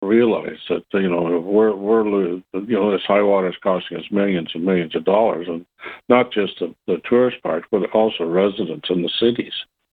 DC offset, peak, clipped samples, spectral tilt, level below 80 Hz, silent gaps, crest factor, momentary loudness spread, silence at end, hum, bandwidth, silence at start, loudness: under 0.1%; 0 dBFS; under 0.1%; -8.5 dB/octave; -60 dBFS; none; 18 dB; 9 LU; 0.3 s; none; 4.6 kHz; 0 s; -19 LUFS